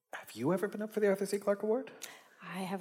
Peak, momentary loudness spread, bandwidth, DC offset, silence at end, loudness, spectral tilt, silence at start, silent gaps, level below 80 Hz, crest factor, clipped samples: -18 dBFS; 16 LU; 16.5 kHz; under 0.1%; 0 s; -34 LUFS; -5.5 dB/octave; 0.15 s; none; under -90 dBFS; 16 dB; under 0.1%